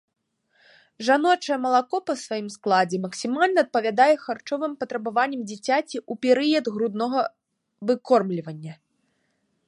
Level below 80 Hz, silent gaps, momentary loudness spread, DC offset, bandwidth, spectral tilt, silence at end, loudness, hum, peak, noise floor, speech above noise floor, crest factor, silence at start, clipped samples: -78 dBFS; none; 11 LU; under 0.1%; 11.5 kHz; -4.5 dB/octave; 0.95 s; -23 LUFS; none; -6 dBFS; -72 dBFS; 49 dB; 18 dB; 1 s; under 0.1%